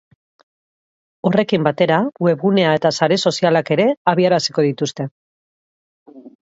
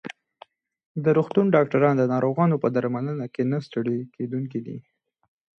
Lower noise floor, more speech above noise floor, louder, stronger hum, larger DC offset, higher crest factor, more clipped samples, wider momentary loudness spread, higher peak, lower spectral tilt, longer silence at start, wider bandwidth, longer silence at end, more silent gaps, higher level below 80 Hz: first, under -90 dBFS vs -53 dBFS; first, over 74 dB vs 30 dB; first, -17 LUFS vs -23 LUFS; neither; neither; about the same, 18 dB vs 18 dB; neither; second, 8 LU vs 13 LU; first, 0 dBFS vs -6 dBFS; second, -5.5 dB/octave vs -9.5 dB/octave; first, 1.25 s vs 0.05 s; first, 8 kHz vs 7 kHz; second, 0.3 s vs 0.8 s; first, 3.97-4.05 s, 5.11-6.06 s vs 0.86-0.95 s; first, -64 dBFS vs -70 dBFS